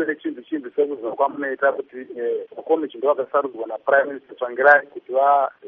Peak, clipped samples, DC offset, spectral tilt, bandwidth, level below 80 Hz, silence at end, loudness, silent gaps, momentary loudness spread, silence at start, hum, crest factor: 0 dBFS; under 0.1%; under 0.1%; -2 dB/octave; 4.9 kHz; -78 dBFS; 0 s; -21 LUFS; none; 13 LU; 0 s; none; 20 dB